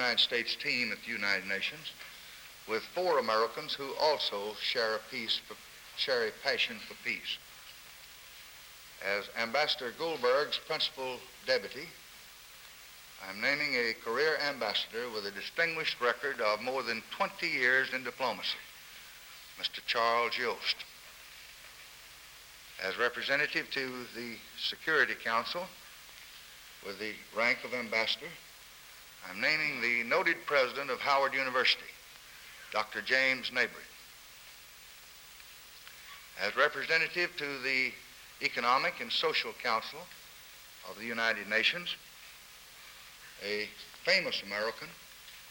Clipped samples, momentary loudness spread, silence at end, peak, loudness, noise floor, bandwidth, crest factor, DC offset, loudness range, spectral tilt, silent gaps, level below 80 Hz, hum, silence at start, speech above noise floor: under 0.1%; 21 LU; 0 s; -12 dBFS; -32 LUFS; -53 dBFS; over 20 kHz; 22 dB; under 0.1%; 5 LU; -2 dB/octave; none; -70 dBFS; none; 0 s; 20 dB